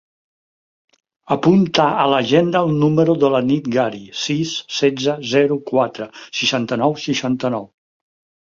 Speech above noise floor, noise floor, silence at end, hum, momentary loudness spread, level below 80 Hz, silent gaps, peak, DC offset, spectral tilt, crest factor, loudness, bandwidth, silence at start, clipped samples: over 73 dB; under -90 dBFS; 0.8 s; none; 8 LU; -58 dBFS; none; 0 dBFS; under 0.1%; -5.5 dB/octave; 18 dB; -17 LUFS; 7.6 kHz; 1.3 s; under 0.1%